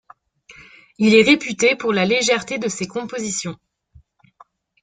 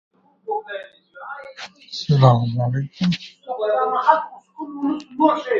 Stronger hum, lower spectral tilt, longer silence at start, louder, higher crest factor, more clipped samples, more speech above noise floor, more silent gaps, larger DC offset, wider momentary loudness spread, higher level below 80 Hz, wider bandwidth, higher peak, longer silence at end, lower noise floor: neither; second, -3.5 dB/octave vs -7.5 dB/octave; about the same, 0.5 s vs 0.45 s; about the same, -18 LUFS vs -20 LUFS; about the same, 20 dB vs 20 dB; neither; first, 35 dB vs 20 dB; neither; neither; second, 13 LU vs 20 LU; about the same, -58 dBFS vs -58 dBFS; first, 9.6 kHz vs 7.2 kHz; about the same, -2 dBFS vs 0 dBFS; first, 1.25 s vs 0 s; first, -53 dBFS vs -39 dBFS